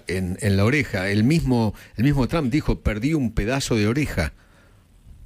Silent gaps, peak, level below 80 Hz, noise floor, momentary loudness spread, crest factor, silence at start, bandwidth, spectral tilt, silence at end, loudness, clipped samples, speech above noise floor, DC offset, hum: none; -8 dBFS; -34 dBFS; -53 dBFS; 6 LU; 14 dB; 0.1 s; 16 kHz; -6 dB/octave; 0 s; -22 LUFS; under 0.1%; 32 dB; under 0.1%; none